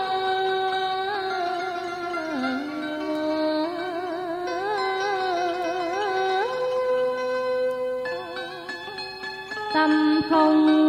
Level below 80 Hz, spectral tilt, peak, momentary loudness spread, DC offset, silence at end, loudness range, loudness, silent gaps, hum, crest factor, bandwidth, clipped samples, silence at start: -64 dBFS; -4.5 dB/octave; -8 dBFS; 12 LU; under 0.1%; 0 s; 3 LU; -25 LUFS; none; 50 Hz at -60 dBFS; 16 dB; 11 kHz; under 0.1%; 0 s